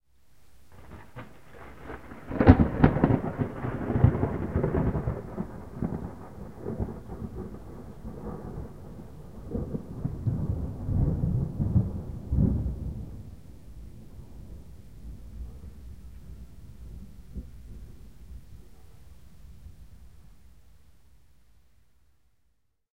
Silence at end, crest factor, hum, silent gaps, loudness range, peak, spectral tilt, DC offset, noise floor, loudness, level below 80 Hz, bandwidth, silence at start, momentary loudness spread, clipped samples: 0 s; 30 dB; none; none; 23 LU; 0 dBFS; -10 dB/octave; 0.4%; -73 dBFS; -29 LUFS; -38 dBFS; 10 kHz; 0 s; 24 LU; under 0.1%